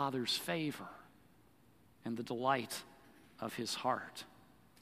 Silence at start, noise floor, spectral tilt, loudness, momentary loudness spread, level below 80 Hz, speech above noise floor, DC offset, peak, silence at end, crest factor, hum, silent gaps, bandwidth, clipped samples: 0 s; -67 dBFS; -3.5 dB/octave; -39 LUFS; 17 LU; -78 dBFS; 29 dB; under 0.1%; -18 dBFS; 0.45 s; 22 dB; none; none; 15 kHz; under 0.1%